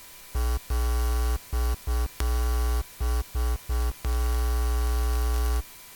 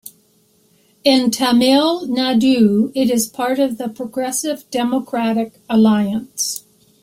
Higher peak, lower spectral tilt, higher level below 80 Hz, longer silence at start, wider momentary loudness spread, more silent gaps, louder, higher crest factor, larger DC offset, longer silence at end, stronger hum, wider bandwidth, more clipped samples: second, -6 dBFS vs -2 dBFS; about the same, -5 dB/octave vs -4 dB/octave; first, -26 dBFS vs -58 dBFS; about the same, 0 s vs 0.05 s; second, 3 LU vs 9 LU; neither; second, -29 LUFS vs -17 LUFS; about the same, 20 dB vs 16 dB; neither; second, 0 s vs 0.45 s; neither; first, 19 kHz vs 16.5 kHz; neither